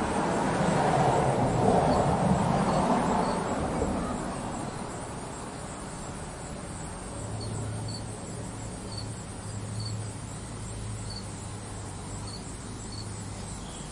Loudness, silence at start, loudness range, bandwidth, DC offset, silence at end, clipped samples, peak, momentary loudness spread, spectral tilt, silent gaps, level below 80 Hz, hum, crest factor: -31 LUFS; 0 s; 12 LU; 11.5 kHz; under 0.1%; 0 s; under 0.1%; -10 dBFS; 14 LU; -5.5 dB/octave; none; -46 dBFS; none; 20 dB